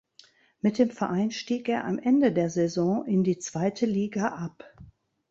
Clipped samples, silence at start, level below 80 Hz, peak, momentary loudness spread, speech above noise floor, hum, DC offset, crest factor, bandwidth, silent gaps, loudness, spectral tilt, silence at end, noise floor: under 0.1%; 0.65 s; -64 dBFS; -10 dBFS; 7 LU; 32 dB; none; under 0.1%; 16 dB; 8 kHz; none; -26 LUFS; -6.5 dB/octave; 0.4 s; -58 dBFS